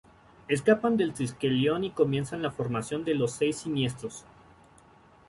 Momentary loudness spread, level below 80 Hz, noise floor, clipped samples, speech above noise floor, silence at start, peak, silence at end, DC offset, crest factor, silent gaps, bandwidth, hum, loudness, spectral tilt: 8 LU; -62 dBFS; -57 dBFS; under 0.1%; 29 dB; 0.5 s; -10 dBFS; 1.1 s; under 0.1%; 20 dB; none; 11.5 kHz; none; -28 LUFS; -5.5 dB/octave